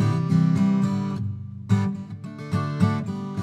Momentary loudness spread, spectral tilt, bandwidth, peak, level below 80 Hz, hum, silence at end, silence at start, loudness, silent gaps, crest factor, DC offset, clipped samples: 14 LU; -8.5 dB/octave; 9.8 kHz; -6 dBFS; -58 dBFS; none; 0 s; 0 s; -24 LUFS; none; 18 dB; under 0.1%; under 0.1%